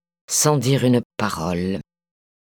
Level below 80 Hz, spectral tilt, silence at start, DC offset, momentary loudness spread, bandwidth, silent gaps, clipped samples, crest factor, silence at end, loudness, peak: -52 dBFS; -4.5 dB/octave; 0.3 s; under 0.1%; 9 LU; 19 kHz; 1.05-1.10 s; under 0.1%; 18 dB; 0.6 s; -20 LUFS; -4 dBFS